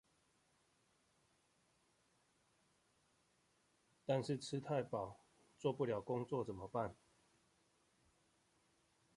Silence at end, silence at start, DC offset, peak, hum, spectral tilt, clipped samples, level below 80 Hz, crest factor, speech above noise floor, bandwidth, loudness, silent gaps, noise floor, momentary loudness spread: 2.25 s; 4.1 s; under 0.1%; -26 dBFS; none; -6.5 dB/octave; under 0.1%; -76 dBFS; 22 dB; 37 dB; 11.5 kHz; -43 LUFS; none; -79 dBFS; 6 LU